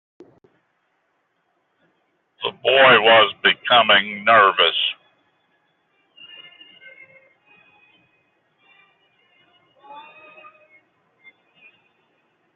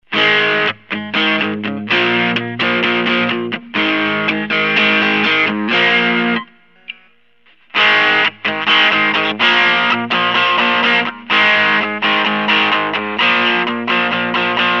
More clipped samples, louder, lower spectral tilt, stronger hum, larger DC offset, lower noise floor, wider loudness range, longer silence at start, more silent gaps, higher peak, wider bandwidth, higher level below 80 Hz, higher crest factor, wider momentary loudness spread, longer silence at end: neither; about the same, -15 LUFS vs -13 LUFS; second, 1 dB/octave vs -4.5 dB/octave; neither; second, under 0.1% vs 0.2%; first, -69 dBFS vs -54 dBFS; first, 6 LU vs 3 LU; first, 2.4 s vs 0.1 s; neither; about the same, -2 dBFS vs 0 dBFS; second, 4.3 kHz vs 7.6 kHz; about the same, -74 dBFS vs -70 dBFS; first, 20 dB vs 14 dB; first, 17 LU vs 7 LU; first, 2.55 s vs 0 s